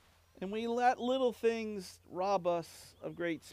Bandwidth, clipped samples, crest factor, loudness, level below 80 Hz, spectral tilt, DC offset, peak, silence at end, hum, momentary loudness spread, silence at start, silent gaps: 15.5 kHz; under 0.1%; 18 dB; -34 LUFS; -74 dBFS; -5 dB/octave; under 0.1%; -18 dBFS; 0 s; none; 15 LU; 0.4 s; none